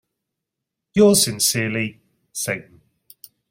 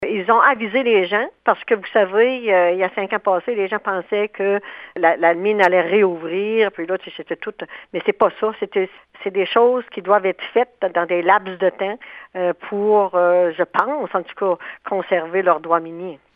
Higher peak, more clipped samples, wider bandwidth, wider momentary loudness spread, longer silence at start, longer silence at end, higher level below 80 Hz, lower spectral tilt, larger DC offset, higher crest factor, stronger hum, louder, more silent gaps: second, -4 dBFS vs 0 dBFS; neither; first, 16.5 kHz vs 5.6 kHz; first, 15 LU vs 10 LU; first, 0.95 s vs 0 s; first, 0.9 s vs 0.2 s; first, -58 dBFS vs -66 dBFS; second, -3.5 dB/octave vs -7 dB/octave; neither; about the same, 20 dB vs 18 dB; neither; about the same, -19 LUFS vs -19 LUFS; neither